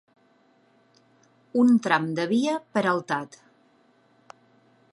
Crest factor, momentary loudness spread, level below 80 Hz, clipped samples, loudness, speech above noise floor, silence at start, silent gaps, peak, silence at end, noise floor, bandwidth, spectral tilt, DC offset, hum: 22 dB; 11 LU; -80 dBFS; under 0.1%; -24 LUFS; 39 dB; 1.55 s; none; -6 dBFS; 1.65 s; -62 dBFS; 10.5 kHz; -5.5 dB/octave; under 0.1%; none